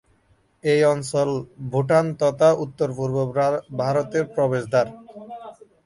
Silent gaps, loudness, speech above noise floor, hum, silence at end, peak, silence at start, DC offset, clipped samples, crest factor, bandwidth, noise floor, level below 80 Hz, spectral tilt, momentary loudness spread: none; -22 LUFS; 41 dB; none; 0.35 s; -6 dBFS; 0.65 s; under 0.1%; under 0.1%; 18 dB; 11.5 kHz; -61 dBFS; -60 dBFS; -6.5 dB/octave; 11 LU